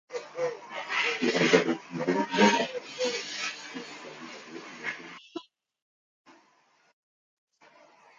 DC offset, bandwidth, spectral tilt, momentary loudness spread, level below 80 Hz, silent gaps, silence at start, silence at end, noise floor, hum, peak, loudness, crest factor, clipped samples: under 0.1%; 9.2 kHz; -3.5 dB/octave; 20 LU; -78 dBFS; 5.82-6.25 s; 0.1 s; 1.9 s; -66 dBFS; none; -6 dBFS; -28 LUFS; 26 dB; under 0.1%